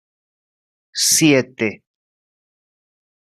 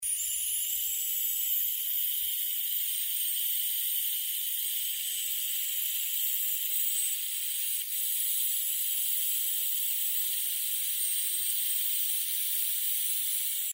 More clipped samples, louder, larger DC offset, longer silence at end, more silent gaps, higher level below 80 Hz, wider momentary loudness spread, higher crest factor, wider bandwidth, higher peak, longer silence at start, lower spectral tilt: neither; first, -16 LUFS vs -27 LUFS; neither; first, 1.45 s vs 0 s; neither; first, -64 dBFS vs -72 dBFS; first, 11 LU vs 2 LU; about the same, 20 dB vs 16 dB; second, 14 kHz vs 16.5 kHz; first, -2 dBFS vs -14 dBFS; first, 0.95 s vs 0 s; first, -3 dB/octave vs 6 dB/octave